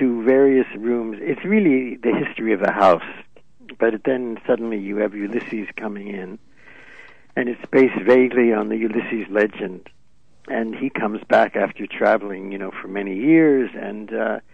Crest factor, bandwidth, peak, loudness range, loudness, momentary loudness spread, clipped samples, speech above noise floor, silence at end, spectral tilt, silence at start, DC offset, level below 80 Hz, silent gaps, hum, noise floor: 16 dB; 7.4 kHz; -4 dBFS; 5 LU; -20 LUFS; 15 LU; under 0.1%; 38 dB; 0.15 s; -8 dB/octave; 0 s; 0.5%; -62 dBFS; none; none; -58 dBFS